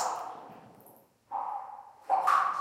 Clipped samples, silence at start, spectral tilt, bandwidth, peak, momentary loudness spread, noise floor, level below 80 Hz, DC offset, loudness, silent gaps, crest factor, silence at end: under 0.1%; 0 s; -1.5 dB/octave; 16 kHz; -14 dBFS; 22 LU; -59 dBFS; -84 dBFS; under 0.1%; -31 LUFS; none; 20 dB; 0 s